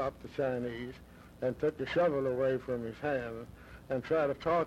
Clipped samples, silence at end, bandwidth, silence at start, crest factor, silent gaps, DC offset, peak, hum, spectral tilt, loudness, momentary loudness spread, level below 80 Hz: under 0.1%; 0 s; 13.5 kHz; 0 s; 14 dB; none; under 0.1%; -20 dBFS; none; -7.5 dB/octave; -34 LUFS; 15 LU; -58 dBFS